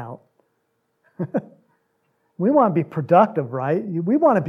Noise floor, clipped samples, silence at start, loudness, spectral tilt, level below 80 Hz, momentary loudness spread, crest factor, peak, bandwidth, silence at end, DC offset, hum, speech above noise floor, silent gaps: -71 dBFS; under 0.1%; 0 s; -20 LUFS; -10 dB/octave; -74 dBFS; 12 LU; 18 dB; -2 dBFS; 6.4 kHz; 0 s; under 0.1%; none; 52 dB; none